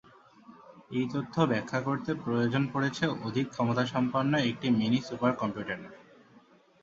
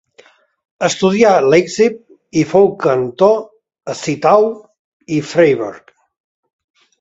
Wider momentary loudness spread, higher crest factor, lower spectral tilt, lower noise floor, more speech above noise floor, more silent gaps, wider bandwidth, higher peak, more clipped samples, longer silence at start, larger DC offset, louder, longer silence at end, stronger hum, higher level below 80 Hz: second, 6 LU vs 13 LU; about the same, 20 dB vs 16 dB; about the same, -6.5 dB/octave vs -5.5 dB/octave; first, -60 dBFS vs -49 dBFS; second, 30 dB vs 36 dB; second, none vs 4.79-5.00 s; about the same, 7.6 kHz vs 8 kHz; second, -10 dBFS vs 0 dBFS; neither; second, 0.5 s vs 0.8 s; neither; second, -30 LUFS vs -14 LUFS; second, 0.8 s vs 1.2 s; neither; second, -66 dBFS vs -56 dBFS